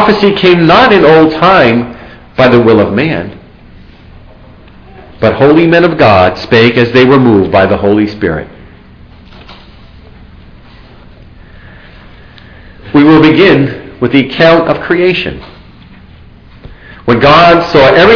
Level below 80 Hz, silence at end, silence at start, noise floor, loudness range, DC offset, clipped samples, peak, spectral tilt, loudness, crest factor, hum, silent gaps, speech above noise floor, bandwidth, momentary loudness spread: -34 dBFS; 0 s; 0 s; -35 dBFS; 6 LU; under 0.1%; 3%; 0 dBFS; -7.5 dB/octave; -6 LUFS; 8 dB; none; none; 29 dB; 5.4 kHz; 11 LU